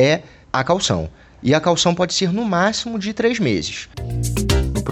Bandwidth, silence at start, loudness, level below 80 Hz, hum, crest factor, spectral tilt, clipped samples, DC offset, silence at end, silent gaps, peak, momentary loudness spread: 16.5 kHz; 0 s; -19 LUFS; -32 dBFS; none; 16 dB; -4.5 dB/octave; under 0.1%; under 0.1%; 0 s; none; -2 dBFS; 8 LU